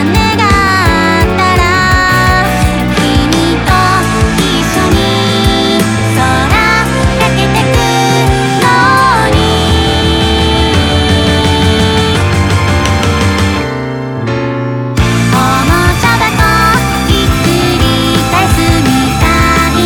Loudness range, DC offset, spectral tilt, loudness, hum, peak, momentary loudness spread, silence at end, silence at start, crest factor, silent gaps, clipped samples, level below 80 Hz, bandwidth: 2 LU; under 0.1%; -5 dB/octave; -9 LUFS; none; 0 dBFS; 3 LU; 0 s; 0 s; 8 dB; none; under 0.1%; -20 dBFS; 20 kHz